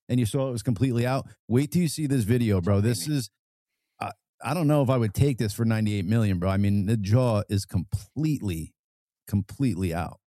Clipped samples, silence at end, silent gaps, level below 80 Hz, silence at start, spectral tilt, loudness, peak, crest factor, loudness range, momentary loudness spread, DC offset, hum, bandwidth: under 0.1%; 0.15 s; 1.39-1.48 s, 3.39-3.66 s, 4.29-4.38 s, 8.79-9.08 s, 9.22-9.26 s; -50 dBFS; 0.1 s; -7 dB/octave; -26 LUFS; -8 dBFS; 16 dB; 3 LU; 10 LU; under 0.1%; none; 14.5 kHz